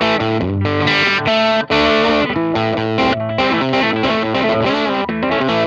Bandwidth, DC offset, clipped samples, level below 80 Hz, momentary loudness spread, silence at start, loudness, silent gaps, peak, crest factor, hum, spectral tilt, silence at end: 8.4 kHz; under 0.1%; under 0.1%; -42 dBFS; 4 LU; 0 s; -15 LUFS; none; -2 dBFS; 14 dB; none; -6 dB/octave; 0 s